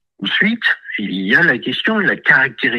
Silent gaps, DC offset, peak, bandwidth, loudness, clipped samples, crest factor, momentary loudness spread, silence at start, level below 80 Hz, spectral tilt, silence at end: none; under 0.1%; 0 dBFS; 12 kHz; -14 LUFS; under 0.1%; 16 dB; 8 LU; 0.2 s; -64 dBFS; -6 dB/octave; 0 s